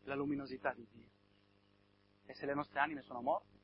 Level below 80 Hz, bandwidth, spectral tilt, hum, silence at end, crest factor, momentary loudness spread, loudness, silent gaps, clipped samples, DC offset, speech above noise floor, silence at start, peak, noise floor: -74 dBFS; 5.6 kHz; -4 dB/octave; 50 Hz at -70 dBFS; 0.25 s; 24 dB; 15 LU; -40 LUFS; none; under 0.1%; under 0.1%; 31 dB; 0.05 s; -20 dBFS; -72 dBFS